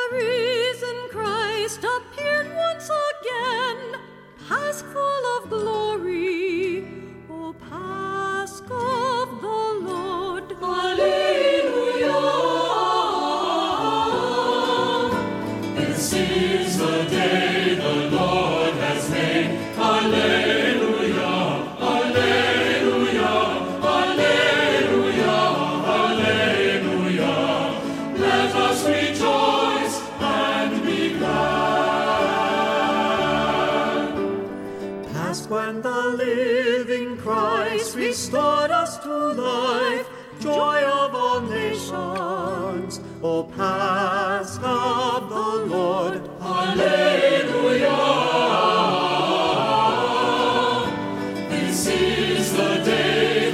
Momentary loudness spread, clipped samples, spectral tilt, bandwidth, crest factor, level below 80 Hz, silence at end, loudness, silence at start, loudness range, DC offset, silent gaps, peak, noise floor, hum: 9 LU; under 0.1%; -4 dB/octave; 16 kHz; 16 dB; -54 dBFS; 0 s; -21 LUFS; 0 s; 6 LU; under 0.1%; none; -6 dBFS; -43 dBFS; none